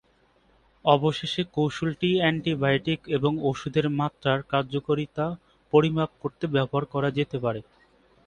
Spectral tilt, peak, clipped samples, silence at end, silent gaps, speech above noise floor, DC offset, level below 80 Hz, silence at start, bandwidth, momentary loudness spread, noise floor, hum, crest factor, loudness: -7 dB/octave; -4 dBFS; under 0.1%; 0.65 s; none; 38 dB; under 0.1%; -58 dBFS; 0.85 s; 9.8 kHz; 8 LU; -63 dBFS; none; 22 dB; -26 LUFS